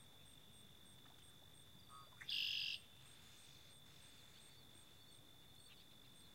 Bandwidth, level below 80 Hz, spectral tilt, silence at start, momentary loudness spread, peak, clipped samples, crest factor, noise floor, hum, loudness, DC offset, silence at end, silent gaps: 16 kHz; -80 dBFS; -1 dB/octave; 0 s; 21 LU; -32 dBFS; under 0.1%; 24 dB; -65 dBFS; none; -45 LUFS; under 0.1%; 0 s; none